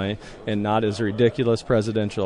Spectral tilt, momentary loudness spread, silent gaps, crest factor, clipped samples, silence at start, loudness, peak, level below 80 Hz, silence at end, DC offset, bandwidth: -7 dB/octave; 8 LU; none; 16 dB; under 0.1%; 0 s; -23 LUFS; -8 dBFS; -48 dBFS; 0 s; under 0.1%; 11 kHz